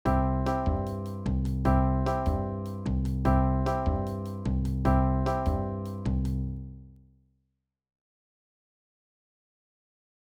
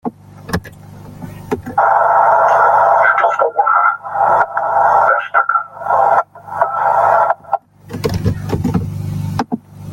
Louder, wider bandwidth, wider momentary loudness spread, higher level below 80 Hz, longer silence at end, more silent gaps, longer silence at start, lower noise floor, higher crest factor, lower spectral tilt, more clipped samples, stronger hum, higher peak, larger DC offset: second, -29 LUFS vs -14 LUFS; second, 10 kHz vs 17 kHz; second, 9 LU vs 14 LU; first, -34 dBFS vs -42 dBFS; first, 3.45 s vs 0 s; neither; about the same, 0.05 s vs 0.05 s; first, -79 dBFS vs -35 dBFS; about the same, 16 dB vs 14 dB; first, -9 dB/octave vs -7 dB/octave; neither; second, none vs 50 Hz at -45 dBFS; second, -12 dBFS vs 0 dBFS; neither